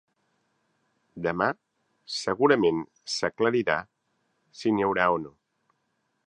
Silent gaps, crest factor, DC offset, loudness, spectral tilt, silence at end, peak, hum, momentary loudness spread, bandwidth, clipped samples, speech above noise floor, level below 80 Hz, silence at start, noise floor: none; 24 dB; under 0.1%; -26 LUFS; -4.5 dB/octave; 1 s; -6 dBFS; none; 11 LU; 10 kHz; under 0.1%; 50 dB; -64 dBFS; 1.15 s; -75 dBFS